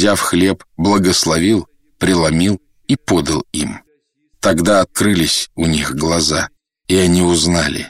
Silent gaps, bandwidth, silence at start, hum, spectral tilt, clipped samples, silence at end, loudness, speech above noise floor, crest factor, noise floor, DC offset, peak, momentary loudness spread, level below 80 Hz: none; 16 kHz; 0 s; none; -4 dB/octave; under 0.1%; 0 s; -15 LUFS; 46 dB; 12 dB; -61 dBFS; under 0.1%; -2 dBFS; 8 LU; -36 dBFS